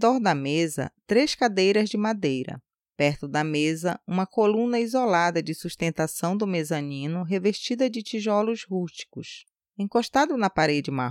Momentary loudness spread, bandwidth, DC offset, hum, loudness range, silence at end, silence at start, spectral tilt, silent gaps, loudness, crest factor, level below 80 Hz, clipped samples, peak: 10 LU; 16.5 kHz; under 0.1%; none; 3 LU; 0 s; 0 s; -5 dB/octave; none; -25 LUFS; 18 dB; -62 dBFS; under 0.1%; -8 dBFS